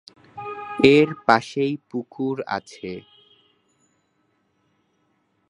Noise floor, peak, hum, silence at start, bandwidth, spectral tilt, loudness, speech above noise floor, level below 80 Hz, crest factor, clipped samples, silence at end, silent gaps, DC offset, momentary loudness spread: -68 dBFS; 0 dBFS; none; 0.35 s; 10.5 kHz; -6 dB/octave; -21 LUFS; 48 dB; -62 dBFS; 24 dB; under 0.1%; 2.5 s; none; under 0.1%; 20 LU